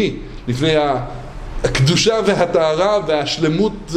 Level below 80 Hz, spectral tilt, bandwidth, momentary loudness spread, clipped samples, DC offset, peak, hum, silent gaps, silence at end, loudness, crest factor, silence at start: -34 dBFS; -5 dB/octave; 13.5 kHz; 13 LU; under 0.1%; under 0.1%; -2 dBFS; none; none; 0 s; -16 LUFS; 16 dB; 0 s